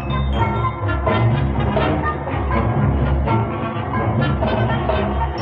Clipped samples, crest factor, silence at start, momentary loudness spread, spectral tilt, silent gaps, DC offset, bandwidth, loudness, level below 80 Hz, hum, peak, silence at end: under 0.1%; 14 dB; 0 s; 4 LU; -9.5 dB/octave; none; under 0.1%; 4.9 kHz; -19 LUFS; -26 dBFS; none; -4 dBFS; 0 s